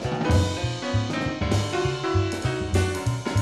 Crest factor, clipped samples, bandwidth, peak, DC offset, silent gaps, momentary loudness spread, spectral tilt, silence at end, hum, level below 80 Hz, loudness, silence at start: 16 dB; under 0.1%; 12.5 kHz; -8 dBFS; 0.1%; none; 5 LU; -5.5 dB/octave; 0 s; none; -38 dBFS; -25 LUFS; 0 s